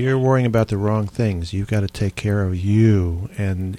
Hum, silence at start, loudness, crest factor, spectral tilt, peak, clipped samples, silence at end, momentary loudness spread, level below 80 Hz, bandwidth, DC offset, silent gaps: none; 0 s; -20 LUFS; 14 dB; -8 dB/octave; -4 dBFS; under 0.1%; 0 s; 8 LU; -38 dBFS; 11 kHz; under 0.1%; none